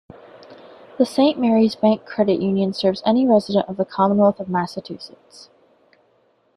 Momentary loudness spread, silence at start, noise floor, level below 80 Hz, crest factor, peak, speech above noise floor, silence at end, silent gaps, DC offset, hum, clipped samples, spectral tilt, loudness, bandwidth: 11 LU; 0.5 s; -61 dBFS; -62 dBFS; 18 dB; -2 dBFS; 42 dB; 1.5 s; none; under 0.1%; none; under 0.1%; -7 dB/octave; -19 LUFS; 11.5 kHz